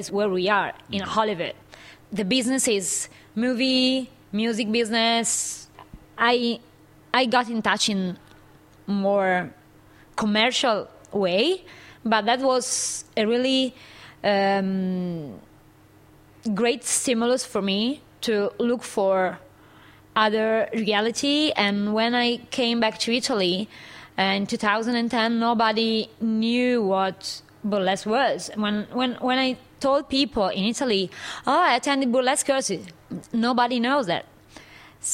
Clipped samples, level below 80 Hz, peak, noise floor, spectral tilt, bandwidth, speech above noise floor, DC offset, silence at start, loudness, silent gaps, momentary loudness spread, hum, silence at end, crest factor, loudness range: under 0.1%; -60 dBFS; -4 dBFS; -53 dBFS; -3.5 dB/octave; 16 kHz; 30 dB; under 0.1%; 0 s; -23 LUFS; none; 10 LU; none; 0 s; 20 dB; 3 LU